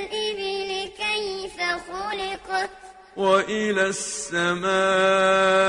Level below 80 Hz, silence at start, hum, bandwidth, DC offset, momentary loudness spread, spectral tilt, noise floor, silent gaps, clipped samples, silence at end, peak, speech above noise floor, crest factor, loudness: -58 dBFS; 0 s; none; 11 kHz; under 0.1%; 11 LU; -3 dB/octave; -45 dBFS; none; under 0.1%; 0 s; -6 dBFS; 24 dB; 18 dB; -23 LUFS